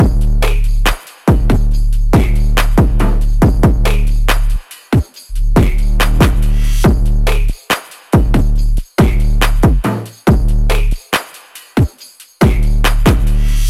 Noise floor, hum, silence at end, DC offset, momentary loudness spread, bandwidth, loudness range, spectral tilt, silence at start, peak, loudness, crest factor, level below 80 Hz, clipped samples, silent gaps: -39 dBFS; none; 0 s; under 0.1%; 6 LU; 15 kHz; 2 LU; -6 dB/octave; 0 s; -2 dBFS; -15 LUFS; 10 dB; -12 dBFS; under 0.1%; none